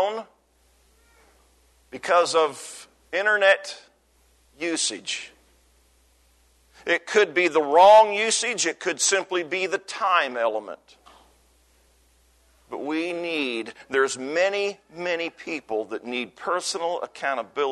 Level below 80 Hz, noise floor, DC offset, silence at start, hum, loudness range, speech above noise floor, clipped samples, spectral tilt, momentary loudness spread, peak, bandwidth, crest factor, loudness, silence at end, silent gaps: -66 dBFS; -62 dBFS; under 0.1%; 0 s; none; 10 LU; 39 dB; under 0.1%; -1 dB/octave; 16 LU; -6 dBFS; 12.5 kHz; 20 dB; -23 LUFS; 0 s; none